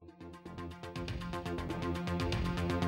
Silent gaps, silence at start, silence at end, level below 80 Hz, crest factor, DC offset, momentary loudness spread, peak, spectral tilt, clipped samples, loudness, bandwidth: none; 0 s; 0 s; -48 dBFS; 16 dB; under 0.1%; 13 LU; -20 dBFS; -6.5 dB/octave; under 0.1%; -38 LUFS; 16 kHz